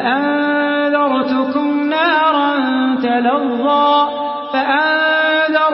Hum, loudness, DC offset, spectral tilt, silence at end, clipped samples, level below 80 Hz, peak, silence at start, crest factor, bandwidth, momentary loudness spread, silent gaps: none; -15 LUFS; under 0.1%; -9 dB/octave; 0 s; under 0.1%; -66 dBFS; -2 dBFS; 0 s; 12 dB; 5.8 kHz; 4 LU; none